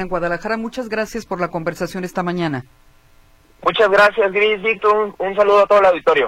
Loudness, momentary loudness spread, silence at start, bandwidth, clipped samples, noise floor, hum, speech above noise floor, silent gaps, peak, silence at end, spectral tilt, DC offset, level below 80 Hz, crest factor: -17 LUFS; 12 LU; 0 s; 15.5 kHz; under 0.1%; -50 dBFS; none; 33 dB; none; -2 dBFS; 0 s; -5 dB/octave; under 0.1%; -46 dBFS; 14 dB